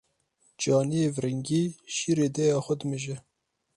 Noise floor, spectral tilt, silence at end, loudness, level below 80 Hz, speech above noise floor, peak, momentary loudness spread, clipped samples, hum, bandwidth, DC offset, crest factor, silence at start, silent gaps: -69 dBFS; -5.5 dB/octave; 0.55 s; -27 LUFS; -66 dBFS; 42 dB; -12 dBFS; 8 LU; under 0.1%; none; 11.5 kHz; under 0.1%; 16 dB; 0.6 s; none